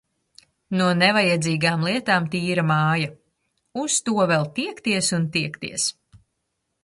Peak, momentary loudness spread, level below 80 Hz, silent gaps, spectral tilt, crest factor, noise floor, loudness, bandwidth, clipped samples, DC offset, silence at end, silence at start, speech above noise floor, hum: -6 dBFS; 10 LU; -62 dBFS; none; -4 dB/octave; 18 dB; -76 dBFS; -21 LUFS; 11.5 kHz; under 0.1%; under 0.1%; 0.95 s; 0.7 s; 55 dB; none